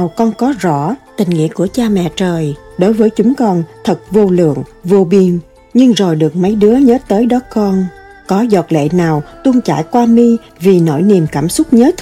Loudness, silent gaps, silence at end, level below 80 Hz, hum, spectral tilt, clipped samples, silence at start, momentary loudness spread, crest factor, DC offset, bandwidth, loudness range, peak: -12 LUFS; none; 0 s; -42 dBFS; none; -7 dB/octave; under 0.1%; 0 s; 7 LU; 10 dB; under 0.1%; 14.5 kHz; 3 LU; 0 dBFS